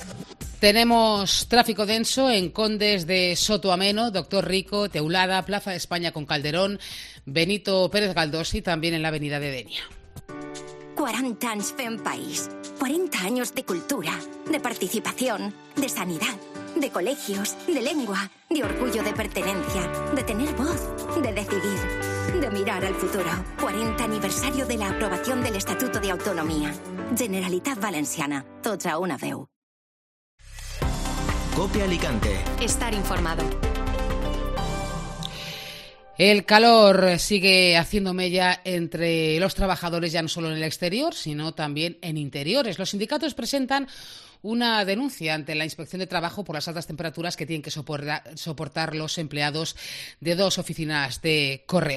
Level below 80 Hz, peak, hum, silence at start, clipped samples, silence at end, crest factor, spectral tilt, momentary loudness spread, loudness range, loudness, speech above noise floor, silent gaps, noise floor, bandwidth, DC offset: -38 dBFS; 0 dBFS; none; 0 s; under 0.1%; 0 s; 24 dB; -4 dB/octave; 11 LU; 9 LU; -24 LUFS; over 66 dB; 29.56-30.38 s; under -90 dBFS; 14 kHz; under 0.1%